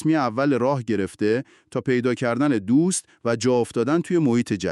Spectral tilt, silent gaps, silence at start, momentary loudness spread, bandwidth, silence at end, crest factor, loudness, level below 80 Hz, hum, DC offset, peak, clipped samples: -6 dB/octave; none; 0 s; 6 LU; 12 kHz; 0 s; 14 dB; -22 LUFS; -62 dBFS; none; under 0.1%; -8 dBFS; under 0.1%